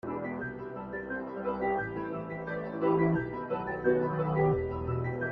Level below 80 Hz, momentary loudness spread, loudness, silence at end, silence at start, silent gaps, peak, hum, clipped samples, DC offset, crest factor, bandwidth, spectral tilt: -54 dBFS; 10 LU; -32 LUFS; 0 s; 0.05 s; none; -14 dBFS; none; under 0.1%; under 0.1%; 18 dB; 5 kHz; -10.5 dB/octave